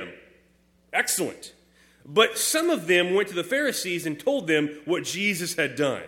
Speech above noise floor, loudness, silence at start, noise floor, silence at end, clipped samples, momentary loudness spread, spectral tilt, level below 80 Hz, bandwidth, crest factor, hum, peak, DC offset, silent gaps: 37 dB; -24 LUFS; 0 s; -62 dBFS; 0 s; under 0.1%; 8 LU; -3 dB/octave; -68 dBFS; 17 kHz; 22 dB; none; -4 dBFS; under 0.1%; none